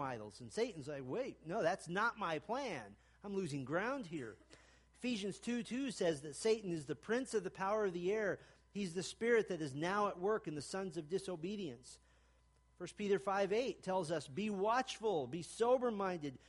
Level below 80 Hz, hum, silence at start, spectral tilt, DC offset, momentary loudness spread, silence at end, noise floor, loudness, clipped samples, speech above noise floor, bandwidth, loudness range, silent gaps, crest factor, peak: -72 dBFS; none; 0 s; -5 dB/octave; under 0.1%; 11 LU; 0.1 s; -71 dBFS; -40 LUFS; under 0.1%; 32 dB; 11.5 kHz; 5 LU; none; 18 dB; -22 dBFS